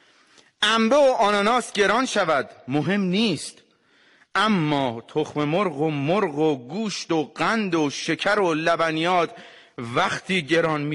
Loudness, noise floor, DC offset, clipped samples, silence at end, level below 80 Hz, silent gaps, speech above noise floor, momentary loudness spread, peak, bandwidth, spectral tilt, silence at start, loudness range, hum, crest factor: -22 LUFS; -59 dBFS; under 0.1%; under 0.1%; 0 s; -62 dBFS; none; 37 dB; 9 LU; -8 dBFS; 11.5 kHz; -4.5 dB/octave; 0.6 s; 3 LU; none; 14 dB